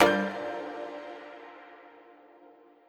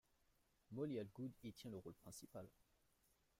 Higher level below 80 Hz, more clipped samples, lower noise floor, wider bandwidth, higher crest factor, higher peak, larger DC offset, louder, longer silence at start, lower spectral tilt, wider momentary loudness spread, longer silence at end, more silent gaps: first, -68 dBFS vs -82 dBFS; neither; second, -56 dBFS vs -81 dBFS; first, over 20 kHz vs 16 kHz; first, 30 dB vs 18 dB; first, -2 dBFS vs -36 dBFS; neither; first, -32 LUFS vs -53 LUFS; second, 0 s vs 0.7 s; second, -4.5 dB/octave vs -6 dB/octave; first, 25 LU vs 11 LU; second, 0.45 s vs 0.9 s; neither